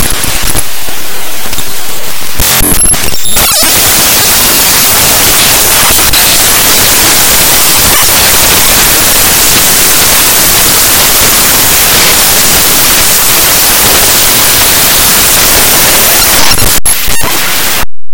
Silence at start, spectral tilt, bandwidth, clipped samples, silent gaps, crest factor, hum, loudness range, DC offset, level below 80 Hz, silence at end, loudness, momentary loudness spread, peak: 0 s; -0.5 dB/octave; over 20 kHz; 9%; none; 6 dB; none; 3 LU; 10%; -22 dBFS; 0 s; -3 LUFS; 7 LU; 0 dBFS